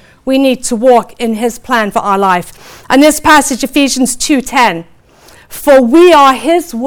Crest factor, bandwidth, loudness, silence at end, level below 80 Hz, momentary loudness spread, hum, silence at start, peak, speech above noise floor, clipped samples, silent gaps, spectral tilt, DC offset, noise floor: 10 dB; over 20 kHz; -9 LUFS; 0 s; -40 dBFS; 11 LU; none; 0.25 s; 0 dBFS; 32 dB; under 0.1%; none; -3 dB/octave; under 0.1%; -41 dBFS